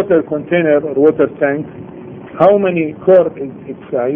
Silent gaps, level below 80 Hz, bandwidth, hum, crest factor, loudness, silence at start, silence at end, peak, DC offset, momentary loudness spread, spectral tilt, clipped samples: none; -54 dBFS; 3.7 kHz; none; 14 dB; -13 LUFS; 0 s; 0 s; 0 dBFS; under 0.1%; 20 LU; -10 dB/octave; under 0.1%